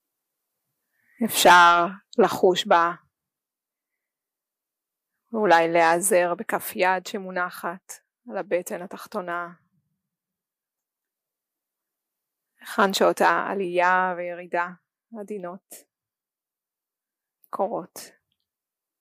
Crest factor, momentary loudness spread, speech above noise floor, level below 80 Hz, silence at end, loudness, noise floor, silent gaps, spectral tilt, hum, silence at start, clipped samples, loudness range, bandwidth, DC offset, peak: 20 dB; 19 LU; over 68 dB; -72 dBFS; 0.95 s; -21 LUFS; under -90 dBFS; none; -3 dB/octave; none; 1.2 s; under 0.1%; 17 LU; 15.5 kHz; under 0.1%; -6 dBFS